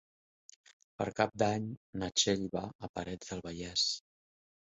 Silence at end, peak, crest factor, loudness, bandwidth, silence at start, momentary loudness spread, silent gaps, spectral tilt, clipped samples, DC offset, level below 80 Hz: 0.7 s; -12 dBFS; 24 dB; -35 LUFS; 8 kHz; 1 s; 12 LU; 1.77-1.93 s, 2.75-2.79 s, 2.89-2.94 s; -3 dB/octave; under 0.1%; under 0.1%; -62 dBFS